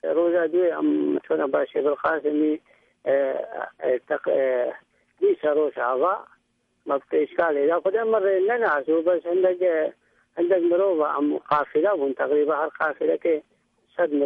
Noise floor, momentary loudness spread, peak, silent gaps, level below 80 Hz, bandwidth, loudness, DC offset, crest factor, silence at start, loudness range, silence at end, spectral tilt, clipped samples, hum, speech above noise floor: -70 dBFS; 7 LU; -8 dBFS; none; -72 dBFS; 4.5 kHz; -23 LUFS; under 0.1%; 14 dB; 0.05 s; 3 LU; 0 s; -8 dB/octave; under 0.1%; none; 48 dB